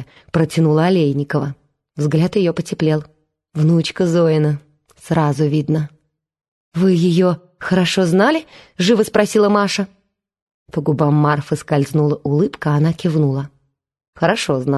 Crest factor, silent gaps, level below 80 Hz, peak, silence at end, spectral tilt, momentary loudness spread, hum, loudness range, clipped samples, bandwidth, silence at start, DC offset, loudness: 16 dB; 6.48-6.72 s, 10.42-10.66 s, 14.08-14.13 s; -54 dBFS; 0 dBFS; 0 s; -6.5 dB/octave; 9 LU; none; 2 LU; under 0.1%; 12.5 kHz; 0 s; under 0.1%; -17 LUFS